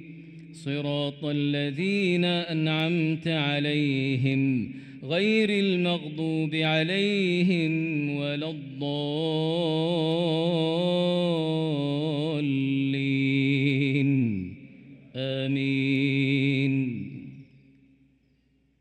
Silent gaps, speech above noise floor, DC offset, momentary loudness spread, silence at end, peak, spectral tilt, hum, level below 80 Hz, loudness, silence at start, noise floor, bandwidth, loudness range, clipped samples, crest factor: none; 41 dB; under 0.1%; 9 LU; 1.35 s; -12 dBFS; -7 dB/octave; none; -70 dBFS; -26 LUFS; 0 s; -66 dBFS; 9.4 kHz; 2 LU; under 0.1%; 14 dB